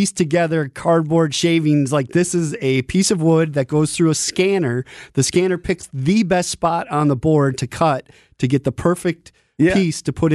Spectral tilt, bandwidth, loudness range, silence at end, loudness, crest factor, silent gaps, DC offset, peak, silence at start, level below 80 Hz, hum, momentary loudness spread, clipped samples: -5.5 dB/octave; 12.5 kHz; 2 LU; 0 s; -18 LUFS; 12 dB; none; under 0.1%; -4 dBFS; 0 s; -46 dBFS; none; 6 LU; under 0.1%